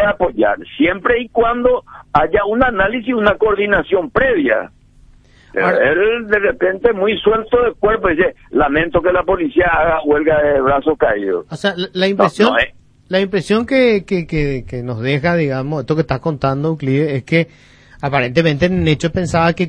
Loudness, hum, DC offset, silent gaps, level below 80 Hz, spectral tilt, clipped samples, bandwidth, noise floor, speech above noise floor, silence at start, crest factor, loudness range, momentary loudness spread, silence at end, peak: -15 LUFS; none; under 0.1%; none; -36 dBFS; -6.5 dB/octave; under 0.1%; 10.5 kHz; -46 dBFS; 31 dB; 0 s; 14 dB; 3 LU; 6 LU; 0 s; 0 dBFS